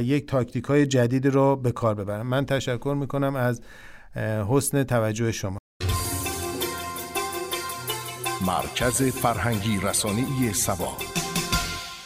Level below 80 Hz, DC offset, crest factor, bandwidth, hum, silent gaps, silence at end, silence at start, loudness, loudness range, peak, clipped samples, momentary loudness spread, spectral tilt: -44 dBFS; under 0.1%; 16 dB; 16 kHz; none; 5.59-5.80 s; 0 s; 0 s; -25 LUFS; 4 LU; -8 dBFS; under 0.1%; 8 LU; -4.5 dB/octave